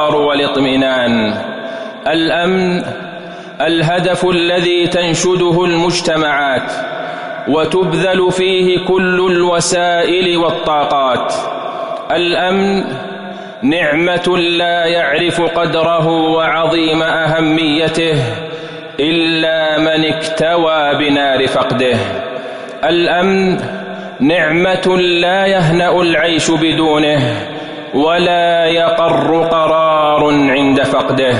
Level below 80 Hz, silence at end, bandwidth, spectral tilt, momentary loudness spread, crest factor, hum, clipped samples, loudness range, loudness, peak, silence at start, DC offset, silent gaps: -46 dBFS; 0 s; 11 kHz; -4.5 dB/octave; 10 LU; 10 dB; none; under 0.1%; 3 LU; -13 LUFS; -4 dBFS; 0 s; under 0.1%; none